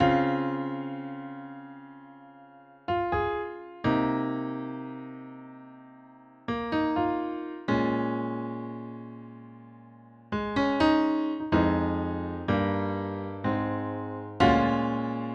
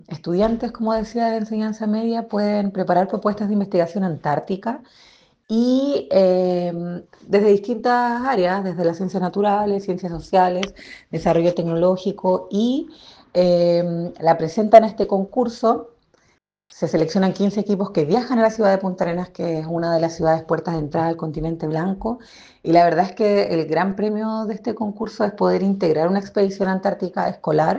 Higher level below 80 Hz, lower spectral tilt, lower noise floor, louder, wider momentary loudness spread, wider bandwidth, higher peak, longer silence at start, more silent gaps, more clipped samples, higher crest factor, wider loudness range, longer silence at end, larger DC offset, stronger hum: about the same, -50 dBFS vs -50 dBFS; about the same, -7.5 dB/octave vs -7.5 dB/octave; second, -53 dBFS vs -63 dBFS; second, -28 LUFS vs -20 LUFS; first, 20 LU vs 9 LU; about the same, 7.6 kHz vs 7.8 kHz; second, -8 dBFS vs 0 dBFS; about the same, 0 s vs 0.1 s; neither; neither; about the same, 20 dB vs 20 dB; about the same, 6 LU vs 4 LU; about the same, 0 s vs 0 s; neither; neither